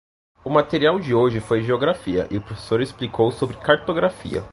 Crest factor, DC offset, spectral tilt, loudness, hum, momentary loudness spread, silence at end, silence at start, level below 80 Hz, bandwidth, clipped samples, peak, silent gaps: 20 dB; under 0.1%; -6.5 dB/octave; -21 LUFS; none; 8 LU; 0.05 s; 0.45 s; -48 dBFS; 11.5 kHz; under 0.1%; -2 dBFS; none